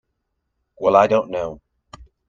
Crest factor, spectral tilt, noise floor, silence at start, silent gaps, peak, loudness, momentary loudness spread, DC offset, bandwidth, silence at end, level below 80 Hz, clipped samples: 22 dB; -6 dB/octave; -75 dBFS; 0.8 s; none; 0 dBFS; -18 LUFS; 13 LU; under 0.1%; 7.4 kHz; 0.25 s; -52 dBFS; under 0.1%